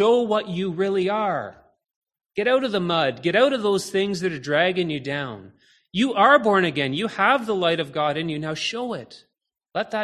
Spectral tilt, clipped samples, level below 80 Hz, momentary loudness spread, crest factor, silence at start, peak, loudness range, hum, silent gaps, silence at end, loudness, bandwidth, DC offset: -5 dB/octave; under 0.1%; -64 dBFS; 11 LU; 20 dB; 0 s; -4 dBFS; 3 LU; none; 1.96-2.02 s; 0 s; -22 LUFS; 13.5 kHz; under 0.1%